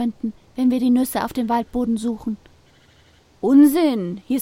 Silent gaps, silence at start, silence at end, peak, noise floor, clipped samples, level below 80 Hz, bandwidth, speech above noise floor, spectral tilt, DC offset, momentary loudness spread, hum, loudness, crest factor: none; 0 s; 0 s; -4 dBFS; -54 dBFS; under 0.1%; -50 dBFS; 16.5 kHz; 35 dB; -5.5 dB/octave; under 0.1%; 16 LU; none; -20 LUFS; 16 dB